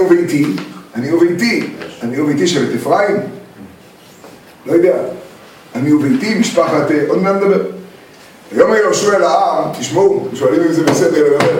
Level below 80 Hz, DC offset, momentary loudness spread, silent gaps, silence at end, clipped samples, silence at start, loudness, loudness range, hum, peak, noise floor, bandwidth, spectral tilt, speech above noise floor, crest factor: -58 dBFS; under 0.1%; 13 LU; none; 0 s; under 0.1%; 0 s; -13 LUFS; 4 LU; none; 0 dBFS; -40 dBFS; 17 kHz; -5 dB/octave; 28 dB; 14 dB